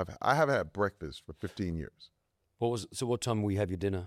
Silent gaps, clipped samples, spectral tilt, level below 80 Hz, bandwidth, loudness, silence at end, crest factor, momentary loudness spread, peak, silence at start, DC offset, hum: none; under 0.1%; -6 dB/octave; -56 dBFS; 15 kHz; -32 LUFS; 0 s; 22 dB; 15 LU; -10 dBFS; 0 s; under 0.1%; none